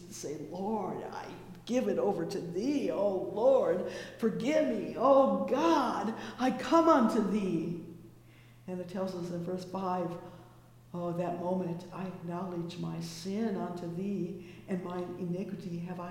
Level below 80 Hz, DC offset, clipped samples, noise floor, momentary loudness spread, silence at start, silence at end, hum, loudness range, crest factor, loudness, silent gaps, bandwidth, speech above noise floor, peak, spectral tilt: -66 dBFS; under 0.1%; under 0.1%; -56 dBFS; 14 LU; 0 s; 0 s; none; 10 LU; 20 dB; -32 LUFS; none; 16.5 kHz; 25 dB; -12 dBFS; -6.5 dB/octave